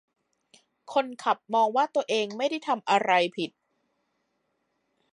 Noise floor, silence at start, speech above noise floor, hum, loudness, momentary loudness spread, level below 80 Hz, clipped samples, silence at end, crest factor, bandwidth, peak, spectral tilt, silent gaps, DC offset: -76 dBFS; 0.9 s; 50 dB; none; -26 LUFS; 7 LU; -84 dBFS; under 0.1%; 1.65 s; 20 dB; 11 kHz; -8 dBFS; -3.5 dB/octave; none; under 0.1%